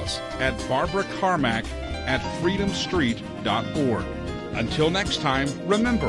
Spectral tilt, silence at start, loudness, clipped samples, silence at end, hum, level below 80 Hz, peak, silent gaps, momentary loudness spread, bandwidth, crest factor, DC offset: -5 dB/octave; 0 s; -25 LUFS; under 0.1%; 0 s; none; -40 dBFS; -8 dBFS; none; 7 LU; 11.5 kHz; 16 dB; under 0.1%